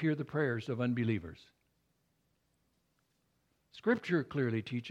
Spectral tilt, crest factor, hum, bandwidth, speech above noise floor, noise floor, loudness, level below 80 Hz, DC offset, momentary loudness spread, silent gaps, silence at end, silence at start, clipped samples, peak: -8 dB/octave; 20 dB; none; 8.6 kHz; 43 dB; -77 dBFS; -34 LUFS; -68 dBFS; under 0.1%; 5 LU; none; 0 s; 0 s; under 0.1%; -18 dBFS